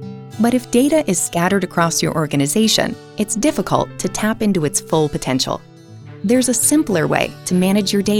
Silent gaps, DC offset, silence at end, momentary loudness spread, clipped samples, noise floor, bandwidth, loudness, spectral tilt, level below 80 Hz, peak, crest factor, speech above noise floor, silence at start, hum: none; under 0.1%; 0 s; 7 LU; under 0.1%; -37 dBFS; 18.5 kHz; -17 LUFS; -4 dB/octave; -46 dBFS; 0 dBFS; 18 dB; 21 dB; 0 s; none